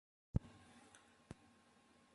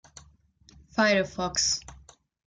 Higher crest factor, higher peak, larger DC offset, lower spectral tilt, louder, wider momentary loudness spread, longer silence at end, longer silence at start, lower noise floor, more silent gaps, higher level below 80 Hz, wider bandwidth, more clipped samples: first, 28 dB vs 20 dB; second, -22 dBFS vs -10 dBFS; neither; first, -7.5 dB/octave vs -2.5 dB/octave; second, -46 LUFS vs -26 LUFS; first, 20 LU vs 8 LU; first, 1.65 s vs 0.5 s; second, 0.35 s vs 0.95 s; first, -71 dBFS vs -59 dBFS; neither; about the same, -58 dBFS vs -54 dBFS; about the same, 11.5 kHz vs 11 kHz; neither